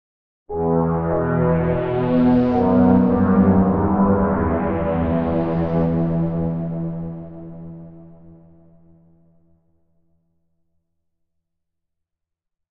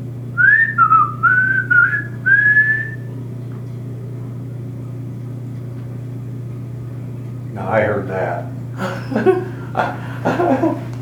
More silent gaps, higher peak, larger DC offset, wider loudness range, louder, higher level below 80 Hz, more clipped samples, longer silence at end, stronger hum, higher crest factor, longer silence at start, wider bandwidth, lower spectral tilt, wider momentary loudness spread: neither; second, -4 dBFS vs 0 dBFS; neither; about the same, 14 LU vs 15 LU; second, -19 LUFS vs -15 LUFS; first, -40 dBFS vs -50 dBFS; neither; first, 4.4 s vs 0 s; second, none vs 60 Hz at -30 dBFS; about the same, 16 dB vs 18 dB; first, 0.5 s vs 0 s; second, 4.6 kHz vs 12 kHz; first, -12 dB/octave vs -7.5 dB/octave; about the same, 16 LU vs 17 LU